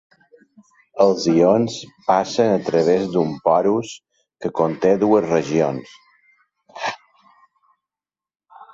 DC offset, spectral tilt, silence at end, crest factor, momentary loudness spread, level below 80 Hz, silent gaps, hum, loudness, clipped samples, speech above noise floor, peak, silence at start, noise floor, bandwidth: under 0.1%; -6 dB/octave; 0.1 s; 18 dB; 13 LU; -60 dBFS; none; none; -19 LUFS; under 0.1%; over 72 dB; -2 dBFS; 0.95 s; under -90 dBFS; 7.8 kHz